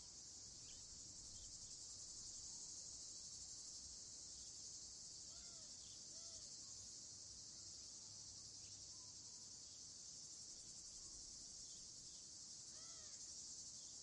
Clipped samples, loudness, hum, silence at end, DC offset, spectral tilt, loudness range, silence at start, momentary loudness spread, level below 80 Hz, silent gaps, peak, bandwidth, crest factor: under 0.1%; -54 LUFS; none; 0 s; under 0.1%; 0 dB/octave; 2 LU; 0 s; 3 LU; -76 dBFS; none; -42 dBFS; 11 kHz; 14 dB